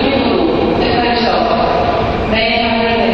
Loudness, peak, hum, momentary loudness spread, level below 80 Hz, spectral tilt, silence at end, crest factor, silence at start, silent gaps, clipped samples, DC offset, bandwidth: -13 LUFS; 0 dBFS; none; 2 LU; -30 dBFS; -7 dB/octave; 0 s; 12 dB; 0 s; none; under 0.1%; under 0.1%; 7 kHz